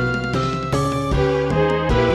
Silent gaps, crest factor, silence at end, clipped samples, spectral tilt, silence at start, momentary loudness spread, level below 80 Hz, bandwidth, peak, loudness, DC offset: none; 14 dB; 0 s; under 0.1%; -6.5 dB/octave; 0 s; 3 LU; -30 dBFS; 13 kHz; -6 dBFS; -20 LUFS; under 0.1%